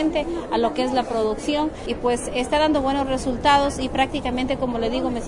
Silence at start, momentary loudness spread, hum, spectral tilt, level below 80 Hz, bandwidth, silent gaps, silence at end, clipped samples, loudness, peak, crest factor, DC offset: 0 s; 6 LU; none; -4.5 dB/octave; -38 dBFS; 11 kHz; none; 0 s; under 0.1%; -22 LUFS; -6 dBFS; 16 dB; under 0.1%